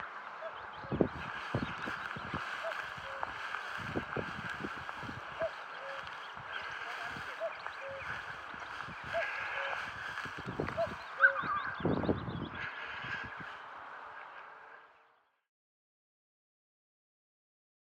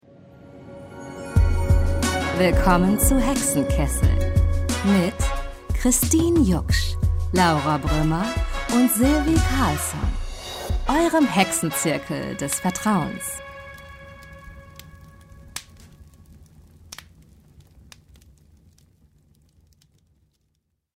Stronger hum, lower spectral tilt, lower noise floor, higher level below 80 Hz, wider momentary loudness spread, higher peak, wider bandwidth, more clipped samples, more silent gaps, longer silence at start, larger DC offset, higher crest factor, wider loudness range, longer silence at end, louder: neither; about the same, -5.5 dB/octave vs -5 dB/octave; about the same, -69 dBFS vs -72 dBFS; second, -64 dBFS vs -30 dBFS; second, 10 LU vs 22 LU; second, -12 dBFS vs -4 dBFS; about the same, 16.5 kHz vs 16 kHz; neither; neither; second, 0 s vs 0.45 s; neither; first, 28 dB vs 18 dB; second, 12 LU vs 17 LU; second, 2.9 s vs 4.9 s; second, -38 LUFS vs -21 LUFS